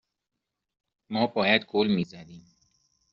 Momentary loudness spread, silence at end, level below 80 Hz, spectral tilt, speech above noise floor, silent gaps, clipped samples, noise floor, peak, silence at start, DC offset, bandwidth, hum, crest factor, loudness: 13 LU; 0.7 s; -66 dBFS; -3 dB/octave; 43 dB; none; under 0.1%; -69 dBFS; -8 dBFS; 1.1 s; under 0.1%; 7.2 kHz; none; 22 dB; -26 LUFS